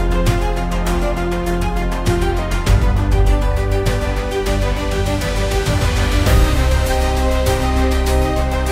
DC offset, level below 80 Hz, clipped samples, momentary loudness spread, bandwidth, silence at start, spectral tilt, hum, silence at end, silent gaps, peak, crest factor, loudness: under 0.1%; -18 dBFS; under 0.1%; 4 LU; 16 kHz; 0 s; -5.5 dB/octave; none; 0 s; none; -2 dBFS; 14 dB; -18 LUFS